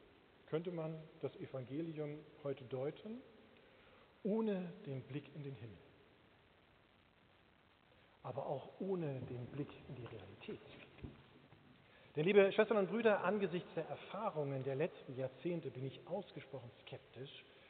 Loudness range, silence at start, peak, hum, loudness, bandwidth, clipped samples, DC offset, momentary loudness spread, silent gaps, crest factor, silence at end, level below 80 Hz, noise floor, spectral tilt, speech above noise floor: 14 LU; 0.45 s; -18 dBFS; none; -41 LUFS; 4.5 kHz; under 0.1%; under 0.1%; 19 LU; none; 24 dB; 0 s; -76 dBFS; -70 dBFS; -5.5 dB/octave; 29 dB